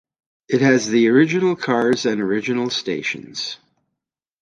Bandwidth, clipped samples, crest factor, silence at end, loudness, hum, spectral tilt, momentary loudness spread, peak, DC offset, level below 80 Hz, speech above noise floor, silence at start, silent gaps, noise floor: 9.6 kHz; under 0.1%; 16 dB; 0.85 s; -19 LUFS; none; -5 dB/octave; 12 LU; -2 dBFS; under 0.1%; -64 dBFS; 64 dB; 0.5 s; none; -82 dBFS